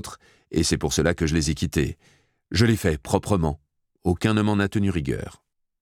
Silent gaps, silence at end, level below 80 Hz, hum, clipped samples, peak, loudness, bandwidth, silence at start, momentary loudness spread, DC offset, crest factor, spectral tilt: none; 0.5 s; -38 dBFS; none; under 0.1%; -4 dBFS; -24 LUFS; 17 kHz; 0.05 s; 9 LU; under 0.1%; 22 dB; -5.5 dB/octave